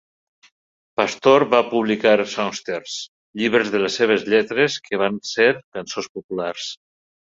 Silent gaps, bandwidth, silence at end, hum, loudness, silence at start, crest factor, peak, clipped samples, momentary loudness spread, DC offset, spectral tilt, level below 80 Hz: 3.08-3.33 s, 5.64-5.72 s, 6.09-6.15 s, 6.24-6.29 s; 7.8 kHz; 0.5 s; none; -20 LUFS; 1 s; 20 dB; -2 dBFS; under 0.1%; 14 LU; under 0.1%; -4 dB/octave; -64 dBFS